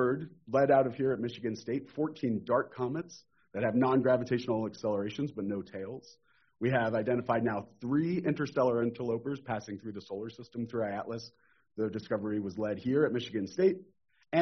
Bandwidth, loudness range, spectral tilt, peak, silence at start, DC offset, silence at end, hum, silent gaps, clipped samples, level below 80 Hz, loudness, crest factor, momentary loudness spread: 6.4 kHz; 5 LU; -6 dB/octave; -14 dBFS; 0 s; under 0.1%; 0 s; none; none; under 0.1%; -70 dBFS; -32 LUFS; 18 dB; 14 LU